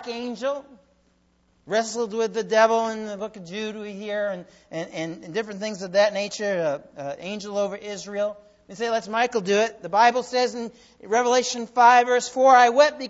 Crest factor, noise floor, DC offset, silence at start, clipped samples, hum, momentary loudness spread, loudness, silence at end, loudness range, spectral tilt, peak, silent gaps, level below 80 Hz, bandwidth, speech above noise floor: 20 dB; -64 dBFS; under 0.1%; 0 s; under 0.1%; none; 17 LU; -23 LUFS; 0 s; 7 LU; -3 dB/octave; -4 dBFS; none; -68 dBFS; 8 kHz; 41 dB